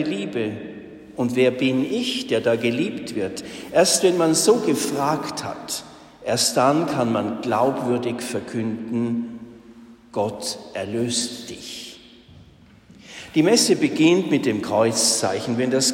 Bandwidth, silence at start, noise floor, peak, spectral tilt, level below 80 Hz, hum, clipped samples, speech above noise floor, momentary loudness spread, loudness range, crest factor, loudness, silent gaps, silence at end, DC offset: 16.5 kHz; 0 s; -49 dBFS; -4 dBFS; -3.5 dB/octave; -60 dBFS; none; under 0.1%; 28 dB; 16 LU; 8 LU; 18 dB; -21 LUFS; none; 0 s; under 0.1%